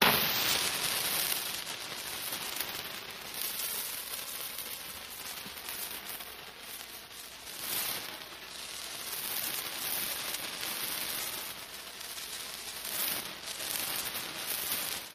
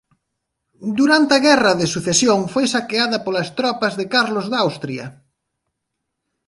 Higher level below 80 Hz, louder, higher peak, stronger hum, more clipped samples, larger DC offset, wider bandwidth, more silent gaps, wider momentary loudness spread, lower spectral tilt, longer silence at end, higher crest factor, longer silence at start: second, -66 dBFS vs -58 dBFS; second, -34 LUFS vs -17 LUFS; second, -8 dBFS vs 0 dBFS; neither; neither; neither; first, 15.5 kHz vs 11.5 kHz; neither; about the same, 12 LU vs 13 LU; second, -0.5 dB/octave vs -3.5 dB/octave; second, 0 s vs 1.35 s; first, 28 dB vs 18 dB; second, 0 s vs 0.8 s